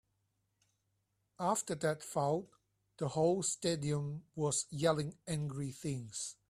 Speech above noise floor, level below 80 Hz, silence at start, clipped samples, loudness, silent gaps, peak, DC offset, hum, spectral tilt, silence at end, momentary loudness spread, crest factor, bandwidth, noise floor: 45 dB; -70 dBFS; 1.4 s; under 0.1%; -36 LUFS; none; -18 dBFS; under 0.1%; none; -4.5 dB/octave; 0.15 s; 8 LU; 20 dB; 15 kHz; -81 dBFS